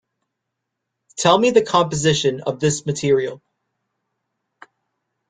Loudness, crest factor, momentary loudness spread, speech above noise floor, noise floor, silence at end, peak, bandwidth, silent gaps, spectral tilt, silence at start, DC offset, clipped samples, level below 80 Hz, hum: -18 LUFS; 20 dB; 7 LU; 62 dB; -79 dBFS; 1.95 s; -2 dBFS; 9.6 kHz; none; -4.5 dB/octave; 1.15 s; under 0.1%; under 0.1%; -56 dBFS; none